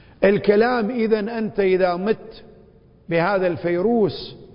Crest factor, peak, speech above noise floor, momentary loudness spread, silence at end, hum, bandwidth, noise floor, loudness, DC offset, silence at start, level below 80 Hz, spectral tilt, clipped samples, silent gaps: 18 dB; -2 dBFS; 31 dB; 8 LU; 0.1 s; none; 5.4 kHz; -50 dBFS; -20 LUFS; under 0.1%; 0.2 s; -52 dBFS; -11.5 dB/octave; under 0.1%; none